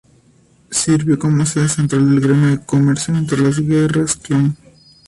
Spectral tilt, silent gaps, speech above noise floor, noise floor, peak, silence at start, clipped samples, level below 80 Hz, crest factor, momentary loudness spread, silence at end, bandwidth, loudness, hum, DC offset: -6 dB/octave; none; 37 dB; -52 dBFS; -4 dBFS; 0.7 s; under 0.1%; -48 dBFS; 12 dB; 4 LU; 0.5 s; 11.5 kHz; -15 LUFS; none; under 0.1%